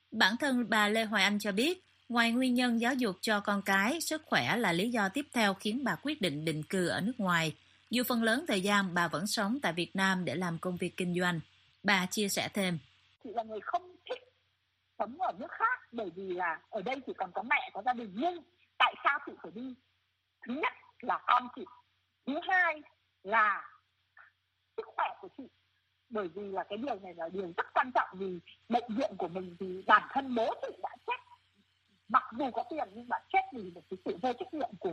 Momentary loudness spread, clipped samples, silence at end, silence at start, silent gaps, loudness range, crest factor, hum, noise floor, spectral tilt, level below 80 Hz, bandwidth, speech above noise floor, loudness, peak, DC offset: 14 LU; under 0.1%; 0 s; 0.1 s; none; 7 LU; 24 dB; none; -78 dBFS; -4 dB/octave; -76 dBFS; 15 kHz; 46 dB; -32 LUFS; -10 dBFS; under 0.1%